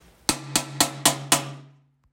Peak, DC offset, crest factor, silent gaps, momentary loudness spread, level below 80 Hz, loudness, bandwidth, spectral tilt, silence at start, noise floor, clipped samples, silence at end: -2 dBFS; under 0.1%; 26 dB; none; 7 LU; -56 dBFS; -22 LUFS; 16.5 kHz; -1.5 dB/octave; 0.3 s; -54 dBFS; under 0.1%; 0.45 s